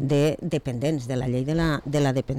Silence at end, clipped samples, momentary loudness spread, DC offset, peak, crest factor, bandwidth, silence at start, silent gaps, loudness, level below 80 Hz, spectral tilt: 0 s; under 0.1%; 5 LU; under 0.1%; -14 dBFS; 10 dB; 14 kHz; 0 s; none; -25 LUFS; -44 dBFS; -7 dB/octave